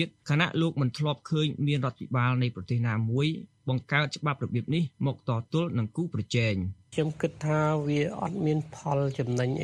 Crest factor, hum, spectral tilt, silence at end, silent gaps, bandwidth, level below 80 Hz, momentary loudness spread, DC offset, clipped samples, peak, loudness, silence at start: 20 dB; none; -7 dB/octave; 0 s; none; 9.8 kHz; -62 dBFS; 5 LU; under 0.1%; under 0.1%; -8 dBFS; -29 LUFS; 0 s